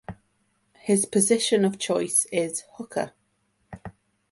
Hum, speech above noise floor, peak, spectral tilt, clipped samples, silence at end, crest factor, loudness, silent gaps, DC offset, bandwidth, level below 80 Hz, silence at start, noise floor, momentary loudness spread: none; 47 dB; -6 dBFS; -3.5 dB/octave; under 0.1%; 0.4 s; 20 dB; -24 LUFS; none; under 0.1%; 12 kHz; -60 dBFS; 0.1 s; -70 dBFS; 22 LU